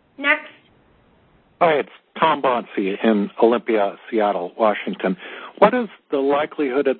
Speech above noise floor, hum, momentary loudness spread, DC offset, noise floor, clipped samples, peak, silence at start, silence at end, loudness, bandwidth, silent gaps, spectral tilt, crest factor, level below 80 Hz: 37 dB; none; 8 LU; under 0.1%; -56 dBFS; under 0.1%; 0 dBFS; 0.2 s; 0 s; -20 LUFS; 4.4 kHz; none; -9 dB/octave; 20 dB; -66 dBFS